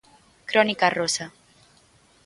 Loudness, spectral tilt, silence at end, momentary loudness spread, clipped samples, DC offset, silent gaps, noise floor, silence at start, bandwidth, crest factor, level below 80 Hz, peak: -22 LUFS; -2.5 dB/octave; 0.95 s; 19 LU; under 0.1%; under 0.1%; none; -58 dBFS; 0.5 s; 11.5 kHz; 22 dB; -68 dBFS; -4 dBFS